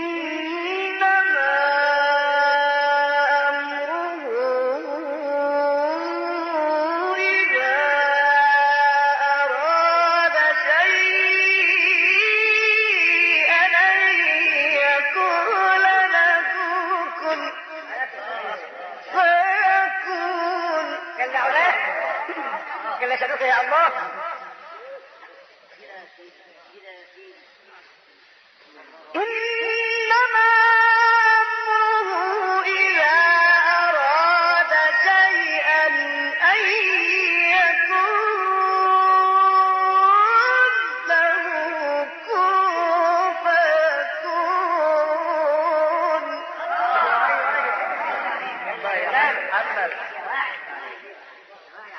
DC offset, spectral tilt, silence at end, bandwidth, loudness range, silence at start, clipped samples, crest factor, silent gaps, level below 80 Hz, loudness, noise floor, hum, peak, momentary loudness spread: under 0.1%; -1.5 dB/octave; 0 s; 11 kHz; 8 LU; 0 s; under 0.1%; 14 dB; none; -72 dBFS; -18 LUFS; -53 dBFS; none; -6 dBFS; 12 LU